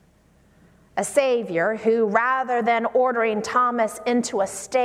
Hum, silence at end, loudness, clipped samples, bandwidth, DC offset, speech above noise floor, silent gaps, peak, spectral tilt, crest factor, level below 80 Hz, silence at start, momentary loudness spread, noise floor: none; 0 s; -22 LUFS; under 0.1%; 15 kHz; under 0.1%; 36 dB; none; -4 dBFS; -4 dB/octave; 18 dB; -64 dBFS; 0.95 s; 5 LU; -57 dBFS